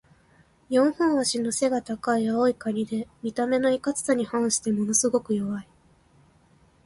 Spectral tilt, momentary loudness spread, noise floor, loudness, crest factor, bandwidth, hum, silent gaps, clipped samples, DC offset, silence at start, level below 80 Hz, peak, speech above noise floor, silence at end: -4 dB/octave; 7 LU; -59 dBFS; -25 LUFS; 16 dB; 11.5 kHz; none; none; under 0.1%; under 0.1%; 0.7 s; -62 dBFS; -10 dBFS; 35 dB; 1.25 s